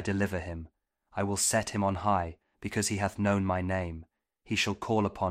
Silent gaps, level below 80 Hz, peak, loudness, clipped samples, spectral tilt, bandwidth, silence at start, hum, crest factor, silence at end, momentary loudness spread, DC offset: none; -54 dBFS; -14 dBFS; -30 LUFS; under 0.1%; -4.5 dB/octave; 16 kHz; 0 s; none; 18 dB; 0 s; 13 LU; under 0.1%